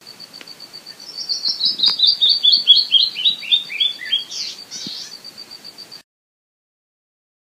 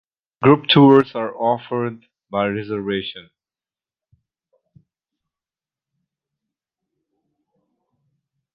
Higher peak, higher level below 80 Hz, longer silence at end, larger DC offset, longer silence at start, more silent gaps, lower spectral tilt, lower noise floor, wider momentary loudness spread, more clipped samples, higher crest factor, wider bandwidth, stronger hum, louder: about the same, 0 dBFS vs -2 dBFS; second, -78 dBFS vs -60 dBFS; second, 1.55 s vs 5.35 s; neither; second, 0.05 s vs 0.4 s; neither; second, 1 dB/octave vs -8.5 dB/octave; second, -39 dBFS vs under -90 dBFS; first, 25 LU vs 15 LU; neither; about the same, 20 dB vs 20 dB; first, 15.5 kHz vs 5.4 kHz; neither; first, -14 LUFS vs -17 LUFS